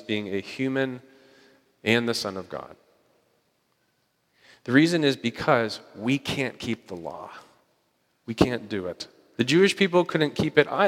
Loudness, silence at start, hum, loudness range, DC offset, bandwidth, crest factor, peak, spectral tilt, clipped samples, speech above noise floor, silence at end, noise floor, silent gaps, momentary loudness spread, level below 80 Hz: -25 LUFS; 0.1 s; none; 6 LU; under 0.1%; 16 kHz; 24 dB; -2 dBFS; -5.5 dB/octave; under 0.1%; 46 dB; 0 s; -71 dBFS; none; 18 LU; -58 dBFS